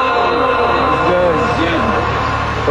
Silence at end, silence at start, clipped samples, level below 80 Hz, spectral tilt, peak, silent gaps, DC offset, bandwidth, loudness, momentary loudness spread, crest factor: 0 s; 0 s; under 0.1%; -30 dBFS; -6 dB/octave; -2 dBFS; none; under 0.1%; 12 kHz; -14 LUFS; 3 LU; 12 dB